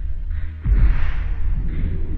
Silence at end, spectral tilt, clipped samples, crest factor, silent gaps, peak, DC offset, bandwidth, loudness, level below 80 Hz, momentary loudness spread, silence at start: 0 s; -9.5 dB/octave; under 0.1%; 12 dB; none; -6 dBFS; under 0.1%; 3.9 kHz; -24 LUFS; -20 dBFS; 10 LU; 0 s